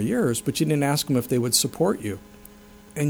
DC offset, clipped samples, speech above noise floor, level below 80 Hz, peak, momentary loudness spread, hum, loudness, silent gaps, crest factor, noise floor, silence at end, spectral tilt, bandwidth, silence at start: under 0.1%; under 0.1%; 25 dB; -54 dBFS; -6 dBFS; 12 LU; none; -23 LUFS; none; 18 dB; -48 dBFS; 0 s; -4.5 dB/octave; over 20 kHz; 0 s